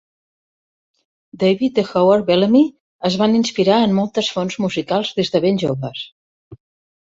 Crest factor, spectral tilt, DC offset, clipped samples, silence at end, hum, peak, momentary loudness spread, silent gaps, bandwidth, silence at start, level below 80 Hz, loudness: 16 dB; -6 dB/octave; under 0.1%; under 0.1%; 0.45 s; none; -2 dBFS; 8 LU; 2.80-2.99 s, 6.12-6.51 s; 7.8 kHz; 1.35 s; -58 dBFS; -17 LUFS